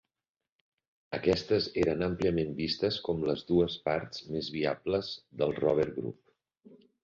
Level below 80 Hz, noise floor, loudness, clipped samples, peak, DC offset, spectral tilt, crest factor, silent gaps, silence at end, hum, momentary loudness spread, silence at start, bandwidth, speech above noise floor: -56 dBFS; -60 dBFS; -31 LUFS; under 0.1%; -12 dBFS; under 0.1%; -6.5 dB/octave; 20 dB; none; 0.3 s; none; 8 LU; 1.1 s; 7.6 kHz; 29 dB